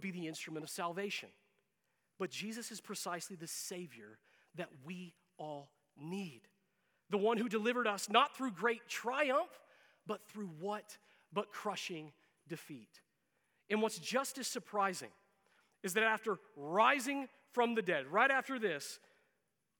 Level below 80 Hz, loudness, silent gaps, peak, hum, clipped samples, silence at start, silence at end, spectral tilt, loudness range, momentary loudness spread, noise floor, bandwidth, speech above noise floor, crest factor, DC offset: under -90 dBFS; -37 LUFS; none; -14 dBFS; none; under 0.1%; 0 s; 0.85 s; -3.5 dB/octave; 11 LU; 19 LU; -84 dBFS; 19.5 kHz; 46 dB; 24 dB; under 0.1%